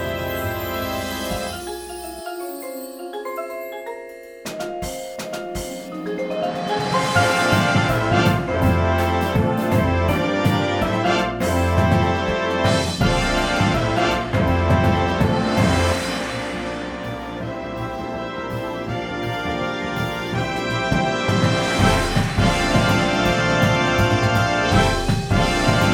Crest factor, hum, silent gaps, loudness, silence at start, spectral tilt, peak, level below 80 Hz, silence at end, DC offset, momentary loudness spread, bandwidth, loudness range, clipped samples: 18 dB; none; none; -20 LUFS; 0 s; -5.5 dB/octave; -2 dBFS; -34 dBFS; 0 s; under 0.1%; 13 LU; over 20 kHz; 11 LU; under 0.1%